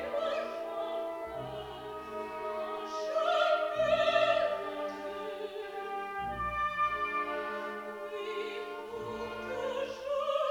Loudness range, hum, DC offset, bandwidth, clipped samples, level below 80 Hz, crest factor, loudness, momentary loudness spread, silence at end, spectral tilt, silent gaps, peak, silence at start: 6 LU; none; under 0.1%; 18 kHz; under 0.1%; -60 dBFS; 20 dB; -34 LUFS; 12 LU; 0 s; -4 dB/octave; none; -14 dBFS; 0 s